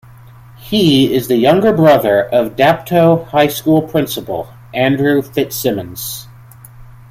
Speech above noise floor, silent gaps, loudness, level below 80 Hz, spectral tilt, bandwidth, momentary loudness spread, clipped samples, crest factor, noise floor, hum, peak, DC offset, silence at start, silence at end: 26 dB; none; -13 LUFS; -46 dBFS; -5.5 dB/octave; 16.5 kHz; 13 LU; under 0.1%; 14 dB; -38 dBFS; none; 0 dBFS; under 0.1%; 0.6 s; 0.25 s